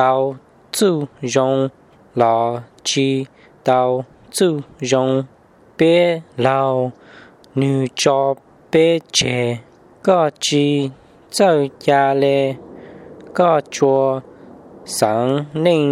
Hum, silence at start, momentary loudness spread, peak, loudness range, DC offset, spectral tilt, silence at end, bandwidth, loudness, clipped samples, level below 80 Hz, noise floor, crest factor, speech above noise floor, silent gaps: none; 0 s; 12 LU; 0 dBFS; 2 LU; under 0.1%; -5 dB/octave; 0 s; 15.5 kHz; -18 LUFS; under 0.1%; -60 dBFS; -44 dBFS; 18 dB; 27 dB; none